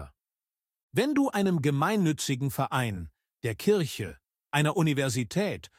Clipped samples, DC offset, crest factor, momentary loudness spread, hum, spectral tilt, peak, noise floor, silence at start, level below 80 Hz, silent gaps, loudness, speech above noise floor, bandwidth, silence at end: under 0.1%; under 0.1%; 18 dB; 10 LU; none; -5.5 dB/octave; -10 dBFS; under -90 dBFS; 0 s; -58 dBFS; 0.83-0.88 s; -28 LUFS; over 63 dB; 16.5 kHz; 0.15 s